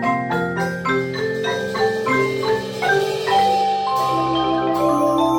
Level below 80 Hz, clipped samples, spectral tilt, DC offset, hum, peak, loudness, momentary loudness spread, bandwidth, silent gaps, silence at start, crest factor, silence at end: -52 dBFS; under 0.1%; -5 dB/octave; under 0.1%; none; -6 dBFS; -19 LUFS; 5 LU; 17 kHz; none; 0 s; 14 dB; 0 s